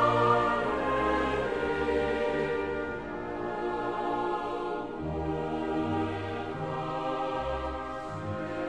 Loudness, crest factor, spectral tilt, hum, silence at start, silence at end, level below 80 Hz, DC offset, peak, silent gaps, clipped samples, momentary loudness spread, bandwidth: -31 LUFS; 18 dB; -7 dB/octave; none; 0 s; 0 s; -48 dBFS; 0.2%; -12 dBFS; none; under 0.1%; 8 LU; 10.5 kHz